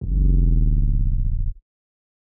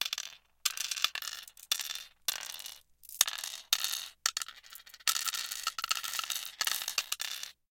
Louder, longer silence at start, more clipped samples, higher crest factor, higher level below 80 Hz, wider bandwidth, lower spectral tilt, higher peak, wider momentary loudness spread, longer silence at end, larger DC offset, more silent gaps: first, -22 LUFS vs -33 LUFS; about the same, 0 s vs 0 s; neither; second, 10 dB vs 34 dB; first, -20 dBFS vs -76 dBFS; second, 0.6 kHz vs 17 kHz; first, -21.5 dB/octave vs 4 dB/octave; second, -8 dBFS vs -2 dBFS; second, 9 LU vs 13 LU; first, 0.7 s vs 0.2 s; neither; neither